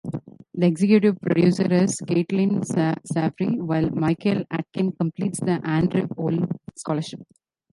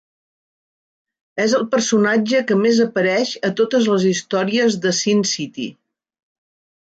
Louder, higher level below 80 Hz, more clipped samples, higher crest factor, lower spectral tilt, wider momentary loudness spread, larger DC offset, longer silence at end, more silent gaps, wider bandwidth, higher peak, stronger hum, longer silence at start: second, -23 LUFS vs -17 LUFS; first, -56 dBFS vs -66 dBFS; neither; about the same, 18 dB vs 14 dB; first, -7 dB/octave vs -4 dB/octave; first, 10 LU vs 7 LU; neither; second, 0.5 s vs 1.15 s; neither; first, 11.5 kHz vs 9.2 kHz; about the same, -6 dBFS vs -6 dBFS; neither; second, 0.05 s vs 1.35 s